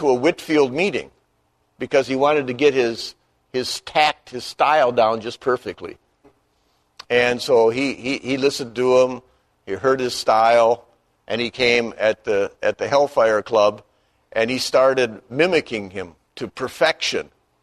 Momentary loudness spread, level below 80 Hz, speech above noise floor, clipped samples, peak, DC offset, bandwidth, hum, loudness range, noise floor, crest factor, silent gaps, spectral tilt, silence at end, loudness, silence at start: 14 LU; -58 dBFS; 47 dB; under 0.1%; -2 dBFS; under 0.1%; 13.5 kHz; none; 2 LU; -66 dBFS; 18 dB; none; -4 dB/octave; 0.4 s; -19 LUFS; 0 s